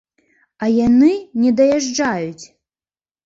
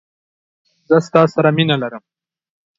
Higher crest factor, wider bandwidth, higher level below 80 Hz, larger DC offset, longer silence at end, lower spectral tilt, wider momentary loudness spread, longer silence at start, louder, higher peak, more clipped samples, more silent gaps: about the same, 14 dB vs 18 dB; about the same, 7.8 kHz vs 7.6 kHz; first, -52 dBFS vs -60 dBFS; neither; about the same, 0.8 s vs 0.8 s; second, -5 dB/octave vs -7 dB/octave; first, 11 LU vs 7 LU; second, 0.6 s vs 0.9 s; about the same, -16 LUFS vs -15 LUFS; second, -4 dBFS vs 0 dBFS; neither; neither